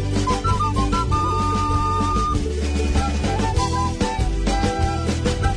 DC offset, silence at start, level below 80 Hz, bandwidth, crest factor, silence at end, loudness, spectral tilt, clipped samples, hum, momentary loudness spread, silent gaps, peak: under 0.1%; 0 s; -24 dBFS; 10.5 kHz; 14 dB; 0 s; -21 LUFS; -5.5 dB/octave; under 0.1%; none; 2 LU; none; -6 dBFS